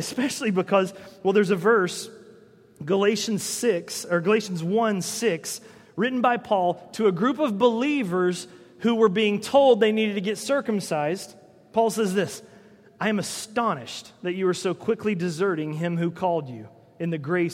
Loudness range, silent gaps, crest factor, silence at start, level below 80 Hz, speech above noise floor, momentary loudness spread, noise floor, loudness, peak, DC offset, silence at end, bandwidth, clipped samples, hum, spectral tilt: 5 LU; none; 18 dB; 0 s; -70 dBFS; 29 dB; 11 LU; -52 dBFS; -24 LUFS; -6 dBFS; under 0.1%; 0 s; 16 kHz; under 0.1%; none; -5 dB/octave